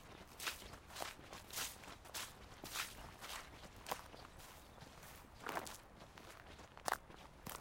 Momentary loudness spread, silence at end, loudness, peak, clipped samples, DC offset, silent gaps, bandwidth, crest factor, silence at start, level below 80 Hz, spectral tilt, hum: 13 LU; 0 s; -49 LUFS; -20 dBFS; under 0.1%; under 0.1%; none; 17 kHz; 32 dB; 0 s; -64 dBFS; -2 dB/octave; none